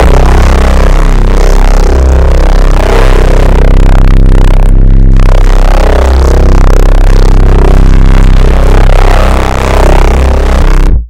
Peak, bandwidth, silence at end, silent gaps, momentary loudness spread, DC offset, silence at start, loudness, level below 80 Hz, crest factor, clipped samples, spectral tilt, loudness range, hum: 0 dBFS; 9.2 kHz; 0 s; none; 2 LU; under 0.1%; 0 s; -7 LUFS; -2 dBFS; 2 dB; 40%; -6.5 dB/octave; 1 LU; none